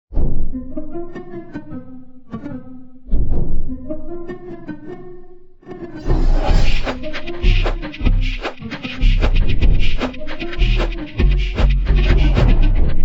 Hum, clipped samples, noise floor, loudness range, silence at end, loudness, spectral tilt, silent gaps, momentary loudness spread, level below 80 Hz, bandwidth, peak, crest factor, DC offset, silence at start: none; under 0.1%; -36 dBFS; 10 LU; 0 s; -21 LUFS; -7 dB/octave; none; 17 LU; -18 dBFS; 6.4 kHz; -2 dBFS; 14 dB; under 0.1%; 0.1 s